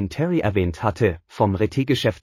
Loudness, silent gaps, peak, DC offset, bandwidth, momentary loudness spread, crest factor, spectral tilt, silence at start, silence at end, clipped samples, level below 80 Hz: -22 LUFS; none; -6 dBFS; under 0.1%; 14.5 kHz; 2 LU; 16 dB; -7 dB/octave; 0 s; 0.05 s; under 0.1%; -42 dBFS